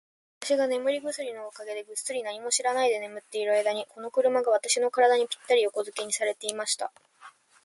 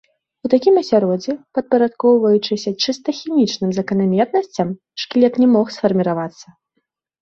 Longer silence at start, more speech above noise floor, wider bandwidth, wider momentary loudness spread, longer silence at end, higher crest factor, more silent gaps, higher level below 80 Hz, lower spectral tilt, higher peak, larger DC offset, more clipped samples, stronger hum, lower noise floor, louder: about the same, 0.4 s vs 0.45 s; second, 26 dB vs 55 dB; first, 11.5 kHz vs 7.2 kHz; about the same, 12 LU vs 10 LU; second, 0.35 s vs 0.8 s; about the same, 20 dB vs 16 dB; neither; second, -82 dBFS vs -60 dBFS; second, -0.5 dB/octave vs -6 dB/octave; second, -8 dBFS vs -2 dBFS; neither; neither; neither; second, -53 dBFS vs -72 dBFS; second, -27 LUFS vs -17 LUFS